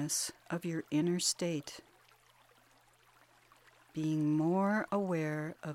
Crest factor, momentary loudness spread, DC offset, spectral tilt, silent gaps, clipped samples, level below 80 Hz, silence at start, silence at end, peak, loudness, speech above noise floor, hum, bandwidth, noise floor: 18 dB; 10 LU; under 0.1%; -4.5 dB/octave; none; under 0.1%; -76 dBFS; 0 s; 0 s; -18 dBFS; -34 LUFS; 32 dB; none; 16.5 kHz; -66 dBFS